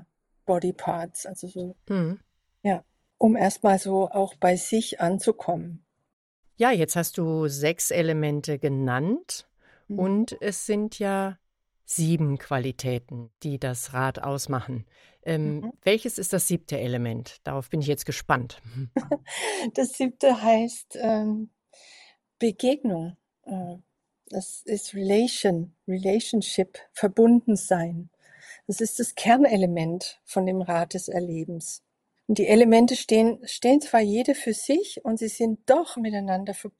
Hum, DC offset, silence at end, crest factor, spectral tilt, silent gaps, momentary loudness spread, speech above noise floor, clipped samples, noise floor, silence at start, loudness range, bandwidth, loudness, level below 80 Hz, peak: none; under 0.1%; 0.1 s; 22 dB; -5 dB/octave; 6.13-6.43 s; 14 LU; 30 dB; under 0.1%; -55 dBFS; 0 s; 7 LU; 16 kHz; -25 LUFS; -62 dBFS; -4 dBFS